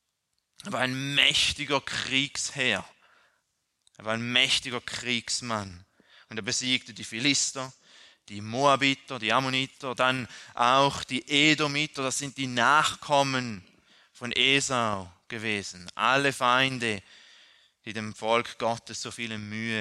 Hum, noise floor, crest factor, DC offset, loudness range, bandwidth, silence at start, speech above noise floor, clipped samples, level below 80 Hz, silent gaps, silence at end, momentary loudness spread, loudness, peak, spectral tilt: none; -79 dBFS; 22 dB; under 0.1%; 4 LU; 13 kHz; 0.65 s; 51 dB; under 0.1%; -64 dBFS; none; 0 s; 15 LU; -26 LUFS; -6 dBFS; -2.5 dB/octave